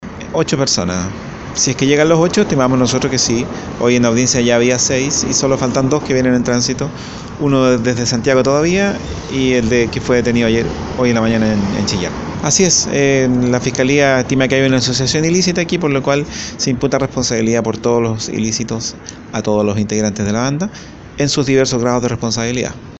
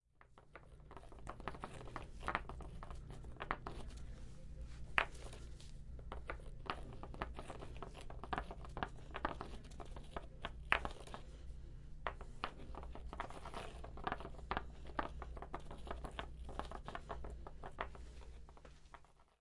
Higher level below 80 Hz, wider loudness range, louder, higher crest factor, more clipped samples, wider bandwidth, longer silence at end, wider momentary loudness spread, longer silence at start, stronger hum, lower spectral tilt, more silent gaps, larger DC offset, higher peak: first, -38 dBFS vs -52 dBFS; about the same, 4 LU vs 5 LU; first, -15 LUFS vs -48 LUFS; second, 14 dB vs 34 dB; neither; second, 8.2 kHz vs 11.5 kHz; second, 0 s vs 0.15 s; second, 9 LU vs 13 LU; second, 0 s vs 0.15 s; neither; about the same, -4.5 dB/octave vs -5 dB/octave; neither; neither; first, 0 dBFS vs -14 dBFS